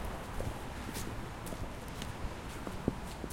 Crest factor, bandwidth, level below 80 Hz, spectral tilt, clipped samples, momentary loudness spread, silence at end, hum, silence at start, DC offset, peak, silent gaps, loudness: 24 dB; 16.5 kHz; -46 dBFS; -5 dB/octave; under 0.1%; 4 LU; 0 s; none; 0 s; under 0.1%; -16 dBFS; none; -42 LUFS